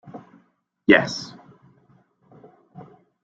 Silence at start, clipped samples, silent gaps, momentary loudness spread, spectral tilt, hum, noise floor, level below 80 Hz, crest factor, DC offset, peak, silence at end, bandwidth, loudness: 0.15 s; under 0.1%; none; 27 LU; -5 dB/octave; none; -63 dBFS; -62 dBFS; 24 dB; under 0.1%; -2 dBFS; 0.4 s; 7.8 kHz; -20 LUFS